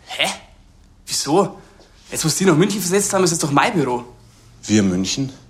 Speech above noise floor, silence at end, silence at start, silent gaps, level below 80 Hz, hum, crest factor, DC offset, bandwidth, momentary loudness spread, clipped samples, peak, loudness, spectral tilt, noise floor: 31 dB; 0.15 s; 0.1 s; none; -50 dBFS; none; 20 dB; under 0.1%; 16 kHz; 9 LU; under 0.1%; 0 dBFS; -18 LUFS; -4 dB/octave; -48 dBFS